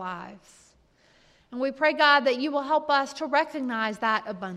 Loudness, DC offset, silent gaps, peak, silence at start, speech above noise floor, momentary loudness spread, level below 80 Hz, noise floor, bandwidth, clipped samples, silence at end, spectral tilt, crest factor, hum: -24 LUFS; under 0.1%; none; -6 dBFS; 0 s; 36 dB; 16 LU; -70 dBFS; -61 dBFS; 12.5 kHz; under 0.1%; 0 s; -4 dB/octave; 20 dB; none